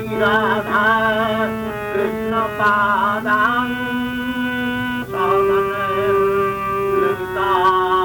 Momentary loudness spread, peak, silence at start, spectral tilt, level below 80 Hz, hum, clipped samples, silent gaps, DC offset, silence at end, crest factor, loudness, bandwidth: 7 LU; -6 dBFS; 0 s; -5.5 dB/octave; -44 dBFS; none; under 0.1%; none; under 0.1%; 0 s; 12 dB; -18 LUFS; 19.5 kHz